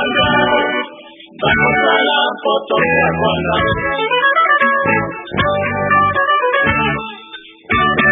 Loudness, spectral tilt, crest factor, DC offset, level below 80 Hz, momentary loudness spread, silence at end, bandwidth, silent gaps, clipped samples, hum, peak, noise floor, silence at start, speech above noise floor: -14 LUFS; -9 dB/octave; 14 dB; under 0.1%; -38 dBFS; 9 LU; 0 s; 3.9 kHz; none; under 0.1%; none; 0 dBFS; -37 dBFS; 0 s; 22 dB